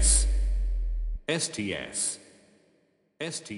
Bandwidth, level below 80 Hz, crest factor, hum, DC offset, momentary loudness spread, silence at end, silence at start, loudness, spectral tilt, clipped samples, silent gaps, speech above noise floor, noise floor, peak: 11.5 kHz; -30 dBFS; 18 dB; none; under 0.1%; 11 LU; 0 s; 0 s; -29 LUFS; -3 dB/octave; under 0.1%; none; 36 dB; -68 dBFS; -10 dBFS